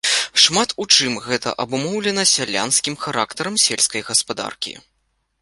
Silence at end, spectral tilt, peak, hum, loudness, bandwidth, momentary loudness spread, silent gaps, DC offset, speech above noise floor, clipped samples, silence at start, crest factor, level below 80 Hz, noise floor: 0.6 s; -1 dB/octave; 0 dBFS; none; -17 LUFS; 12 kHz; 10 LU; none; under 0.1%; 49 dB; under 0.1%; 0.05 s; 20 dB; -60 dBFS; -69 dBFS